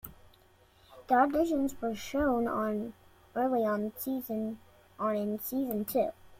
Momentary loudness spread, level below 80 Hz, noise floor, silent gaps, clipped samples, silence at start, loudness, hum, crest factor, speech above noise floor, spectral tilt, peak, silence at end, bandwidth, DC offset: 10 LU; -58 dBFS; -62 dBFS; none; under 0.1%; 0.05 s; -31 LUFS; none; 18 dB; 32 dB; -6 dB/octave; -14 dBFS; 0 s; 16.5 kHz; under 0.1%